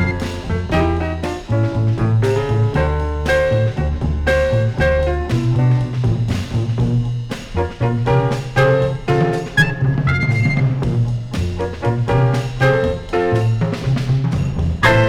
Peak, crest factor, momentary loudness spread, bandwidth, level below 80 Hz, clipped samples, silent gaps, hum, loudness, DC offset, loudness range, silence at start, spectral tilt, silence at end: 0 dBFS; 16 dB; 6 LU; 11.5 kHz; -28 dBFS; under 0.1%; none; none; -18 LUFS; under 0.1%; 2 LU; 0 s; -7 dB/octave; 0 s